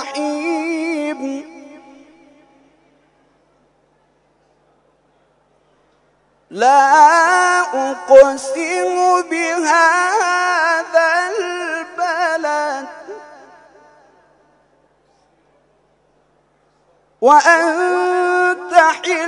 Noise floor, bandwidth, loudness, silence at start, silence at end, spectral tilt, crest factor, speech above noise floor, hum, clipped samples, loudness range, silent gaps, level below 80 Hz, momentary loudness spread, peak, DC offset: -58 dBFS; 11 kHz; -14 LUFS; 0 s; 0 s; -1.5 dB/octave; 18 dB; 47 dB; 50 Hz at -70 dBFS; 0.2%; 14 LU; none; -60 dBFS; 14 LU; 0 dBFS; under 0.1%